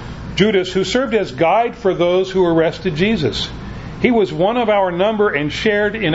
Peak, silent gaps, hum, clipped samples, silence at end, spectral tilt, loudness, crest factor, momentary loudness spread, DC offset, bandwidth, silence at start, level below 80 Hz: 0 dBFS; none; none; under 0.1%; 0 s; -6 dB/octave; -16 LUFS; 16 dB; 5 LU; under 0.1%; 8 kHz; 0 s; -38 dBFS